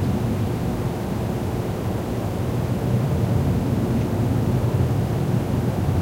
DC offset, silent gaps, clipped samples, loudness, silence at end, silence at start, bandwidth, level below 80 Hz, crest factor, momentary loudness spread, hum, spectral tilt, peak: under 0.1%; none; under 0.1%; -23 LUFS; 0 s; 0 s; 16 kHz; -34 dBFS; 12 dB; 4 LU; none; -8 dB/octave; -10 dBFS